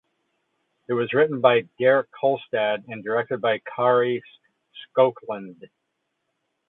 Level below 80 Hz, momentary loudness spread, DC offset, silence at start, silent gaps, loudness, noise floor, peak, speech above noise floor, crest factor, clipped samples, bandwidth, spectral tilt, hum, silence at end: -74 dBFS; 11 LU; under 0.1%; 0.9 s; none; -22 LUFS; -77 dBFS; -2 dBFS; 55 dB; 22 dB; under 0.1%; 4.1 kHz; -9.5 dB/octave; none; 1.15 s